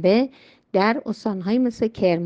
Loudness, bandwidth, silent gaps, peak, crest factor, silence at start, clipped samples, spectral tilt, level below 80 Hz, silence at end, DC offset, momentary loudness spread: -22 LUFS; 7.8 kHz; none; -4 dBFS; 18 dB; 0 s; under 0.1%; -7.5 dB/octave; -58 dBFS; 0 s; under 0.1%; 6 LU